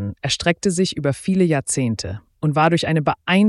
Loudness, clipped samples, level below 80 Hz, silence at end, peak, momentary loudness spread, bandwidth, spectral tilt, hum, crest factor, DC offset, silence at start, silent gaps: -20 LUFS; under 0.1%; -48 dBFS; 0 s; -4 dBFS; 7 LU; 12 kHz; -5 dB/octave; none; 14 dB; under 0.1%; 0 s; none